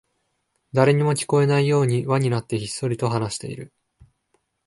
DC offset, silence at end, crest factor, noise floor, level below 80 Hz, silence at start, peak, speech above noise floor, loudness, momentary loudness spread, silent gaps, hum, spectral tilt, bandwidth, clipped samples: under 0.1%; 1 s; 20 dB; -73 dBFS; -58 dBFS; 0.75 s; -2 dBFS; 52 dB; -21 LUFS; 10 LU; none; none; -6 dB/octave; 11.5 kHz; under 0.1%